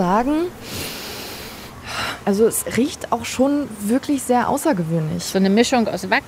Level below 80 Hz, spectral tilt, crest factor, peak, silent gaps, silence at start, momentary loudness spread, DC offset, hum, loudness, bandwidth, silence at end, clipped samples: -48 dBFS; -4.5 dB/octave; 18 dB; -2 dBFS; none; 0 s; 12 LU; under 0.1%; none; -20 LUFS; 16 kHz; 0 s; under 0.1%